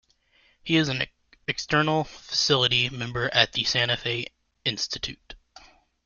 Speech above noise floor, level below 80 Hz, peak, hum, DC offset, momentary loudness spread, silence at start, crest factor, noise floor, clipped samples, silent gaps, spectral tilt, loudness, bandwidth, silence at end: 38 dB; -54 dBFS; -2 dBFS; none; under 0.1%; 12 LU; 0.65 s; 24 dB; -63 dBFS; under 0.1%; none; -3.5 dB/octave; -24 LUFS; 7.4 kHz; 0.7 s